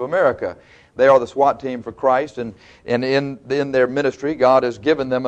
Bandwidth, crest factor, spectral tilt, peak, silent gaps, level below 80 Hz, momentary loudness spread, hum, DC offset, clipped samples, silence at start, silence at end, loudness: 8.4 kHz; 16 dB; -6 dB/octave; -2 dBFS; none; -56 dBFS; 14 LU; none; under 0.1%; under 0.1%; 0 s; 0 s; -18 LUFS